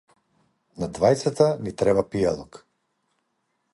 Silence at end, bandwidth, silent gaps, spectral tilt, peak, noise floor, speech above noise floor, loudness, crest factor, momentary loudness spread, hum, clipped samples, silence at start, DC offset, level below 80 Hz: 1.15 s; 11.5 kHz; none; -6 dB/octave; -4 dBFS; -74 dBFS; 52 dB; -23 LUFS; 20 dB; 12 LU; none; under 0.1%; 0.8 s; under 0.1%; -52 dBFS